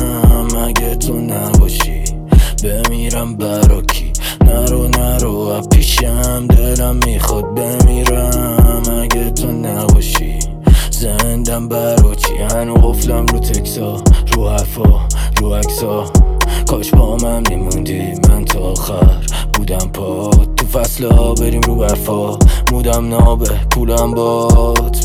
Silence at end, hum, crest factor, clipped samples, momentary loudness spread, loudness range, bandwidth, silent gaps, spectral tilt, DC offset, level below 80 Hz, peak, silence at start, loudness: 0 s; none; 12 dB; under 0.1%; 6 LU; 1 LU; 17 kHz; none; -5 dB/octave; under 0.1%; -14 dBFS; 0 dBFS; 0 s; -14 LUFS